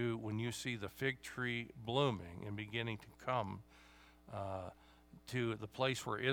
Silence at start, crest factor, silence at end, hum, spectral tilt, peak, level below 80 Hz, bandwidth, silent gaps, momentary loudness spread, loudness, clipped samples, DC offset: 0 s; 22 dB; 0 s; none; -5 dB/octave; -20 dBFS; -68 dBFS; over 20 kHz; none; 10 LU; -41 LUFS; under 0.1%; under 0.1%